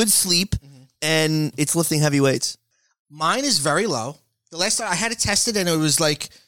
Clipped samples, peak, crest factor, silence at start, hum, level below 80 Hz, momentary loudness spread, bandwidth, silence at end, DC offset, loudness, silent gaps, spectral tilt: under 0.1%; -6 dBFS; 16 dB; 0 s; none; -46 dBFS; 9 LU; 18 kHz; 0.2 s; 0.2%; -20 LUFS; 2.99-3.05 s; -3 dB/octave